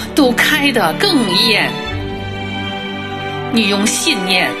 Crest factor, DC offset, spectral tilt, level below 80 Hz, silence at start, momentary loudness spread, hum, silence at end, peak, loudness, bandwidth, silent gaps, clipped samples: 16 dB; under 0.1%; -3 dB/octave; -40 dBFS; 0 s; 11 LU; none; 0 s; 0 dBFS; -14 LUFS; 15 kHz; none; under 0.1%